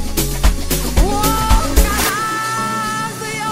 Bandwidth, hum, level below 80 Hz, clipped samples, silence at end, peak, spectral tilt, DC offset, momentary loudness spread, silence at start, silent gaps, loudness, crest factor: 16.5 kHz; none; -18 dBFS; under 0.1%; 0 s; 0 dBFS; -3.5 dB/octave; under 0.1%; 6 LU; 0 s; none; -17 LUFS; 16 dB